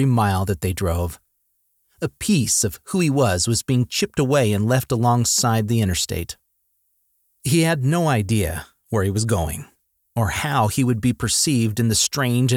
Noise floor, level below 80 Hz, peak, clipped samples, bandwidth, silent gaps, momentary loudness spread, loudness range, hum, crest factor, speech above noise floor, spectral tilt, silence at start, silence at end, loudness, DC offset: -69 dBFS; -42 dBFS; -6 dBFS; under 0.1%; 17.5 kHz; none; 10 LU; 3 LU; none; 14 dB; 49 dB; -4.5 dB/octave; 0 s; 0 s; -20 LUFS; under 0.1%